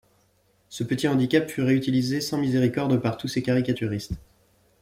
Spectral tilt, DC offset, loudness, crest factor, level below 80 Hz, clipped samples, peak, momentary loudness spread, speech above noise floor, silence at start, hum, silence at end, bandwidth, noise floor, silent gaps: -6 dB/octave; under 0.1%; -24 LUFS; 18 dB; -52 dBFS; under 0.1%; -6 dBFS; 11 LU; 41 dB; 0.7 s; none; 0.65 s; 16 kHz; -65 dBFS; none